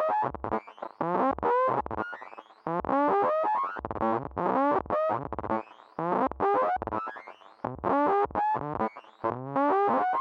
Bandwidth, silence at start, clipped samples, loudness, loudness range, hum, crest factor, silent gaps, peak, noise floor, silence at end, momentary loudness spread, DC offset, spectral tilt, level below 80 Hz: 6.6 kHz; 0 s; under 0.1%; -28 LUFS; 1 LU; none; 14 dB; none; -14 dBFS; -47 dBFS; 0 s; 12 LU; under 0.1%; -8.5 dB/octave; -56 dBFS